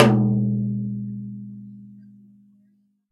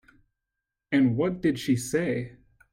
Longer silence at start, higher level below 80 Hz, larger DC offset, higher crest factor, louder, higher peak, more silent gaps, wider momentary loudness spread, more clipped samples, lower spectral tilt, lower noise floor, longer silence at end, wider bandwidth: second, 0 s vs 0.9 s; about the same, -58 dBFS vs -60 dBFS; neither; first, 24 dB vs 16 dB; first, -23 LUFS vs -26 LUFS; first, 0 dBFS vs -12 dBFS; neither; first, 23 LU vs 8 LU; neither; first, -7.5 dB/octave vs -6 dB/octave; second, -63 dBFS vs -86 dBFS; first, 1.1 s vs 0.4 s; second, 9.8 kHz vs 15.5 kHz